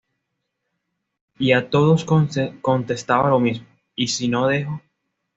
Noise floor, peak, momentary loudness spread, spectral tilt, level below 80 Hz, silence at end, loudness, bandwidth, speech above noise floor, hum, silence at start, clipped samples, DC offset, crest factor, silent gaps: -77 dBFS; -4 dBFS; 11 LU; -5.5 dB/octave; -58 dBFS; 0.6 s; -20 LUFS; 8 kHz; 58 dB; none; 1.4 s; under 0.1%; under 0.1%; 18 dB; none